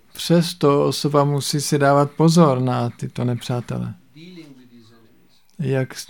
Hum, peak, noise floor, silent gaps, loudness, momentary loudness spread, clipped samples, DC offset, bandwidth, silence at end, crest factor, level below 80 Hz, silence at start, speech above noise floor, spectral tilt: none; -2 dBFS; -57 dBFS; none; -19 LUFS; 11 LU; under 0.1%; 0.2%; 17.5 kHz; 0.05 s; 18 dB; -58 dBFS; 0.15 s; 39 dB; -6 dB/octave